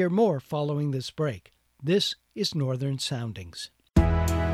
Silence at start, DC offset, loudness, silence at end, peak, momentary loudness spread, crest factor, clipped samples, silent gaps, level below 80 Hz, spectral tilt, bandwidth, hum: 0 s; under 0.1%; -27 LUFS; 0 s; -8 dBFS; 12 LU; 18 dB; under 0.1%; none; -36 dBFS; -6 dB/octave; 15 kHz; none